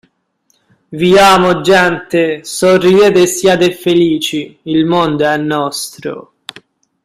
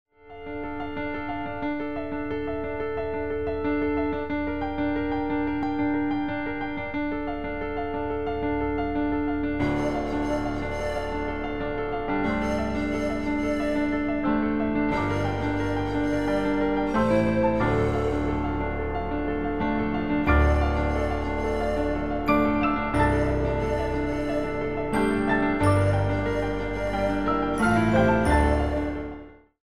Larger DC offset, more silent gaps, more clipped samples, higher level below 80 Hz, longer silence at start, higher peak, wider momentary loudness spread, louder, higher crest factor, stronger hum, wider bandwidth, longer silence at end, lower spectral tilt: second, under 0.1% vs 0.9%; neither; neither; second, -48 dBFS vs -36 dBFS; first, 0.9 s vs 0.05 s; first, 0 dBFS vs -8 dBFS; first, 17 LU vs 8 LU; first, -11 LUFS vs -26 LUFS; about the same, 12 dB vs 16 dB; neither; first, 15.5 kHz vs 11 kHz; first, 0.85 s vs 0.05 s; second, -4.5 dB/octave vs -7.5 dB/octave